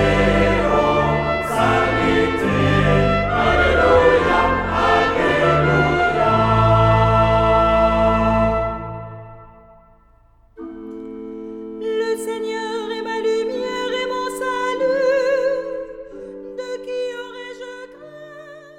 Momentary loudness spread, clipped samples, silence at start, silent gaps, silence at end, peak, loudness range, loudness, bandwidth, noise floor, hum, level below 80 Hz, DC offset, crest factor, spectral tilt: 19 LU; under 0.1%; 0 s; none; 0.1 s; -2 dBFS; 12 LU; -17 LUFS; 15 kHz; -52 dBFS; none; -32 dBFS; under 0.1%; 16 dB; -6.5 dB/octave